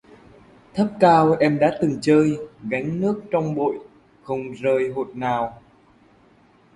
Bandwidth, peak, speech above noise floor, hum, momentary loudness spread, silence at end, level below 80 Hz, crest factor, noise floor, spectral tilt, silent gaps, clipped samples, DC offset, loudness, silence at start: 11.5 kHz; -2 dBFS; 35 dB; none; 14 LU; 1.2 s; -58 dBFS; 20 dB; -55 dBFS; -7.5 dB/octave; none; under 0.1%; under 0.1%; -21 LUFS; 0.75 s